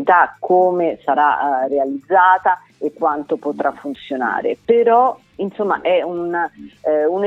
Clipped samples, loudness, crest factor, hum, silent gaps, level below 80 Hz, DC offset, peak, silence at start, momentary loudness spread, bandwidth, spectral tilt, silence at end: under 0.1%; -17 LUFS; 16 dB; none; none; -62 dBFS; under 0.1%; 0 dBFS; 0 s; 10 LU; 7.4 kHz; -7 dB/octave; 0 s